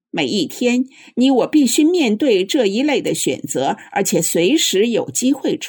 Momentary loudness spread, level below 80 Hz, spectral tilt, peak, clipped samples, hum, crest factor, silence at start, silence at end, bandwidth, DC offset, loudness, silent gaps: 6 LU; -68 dBFS; -3.5 dB/octave; -4 dBFS; under 0.1%; none; 12 dB; 0.15 s; 0 s; 19.5 kHz; under 0.1%; -16 LUFS; none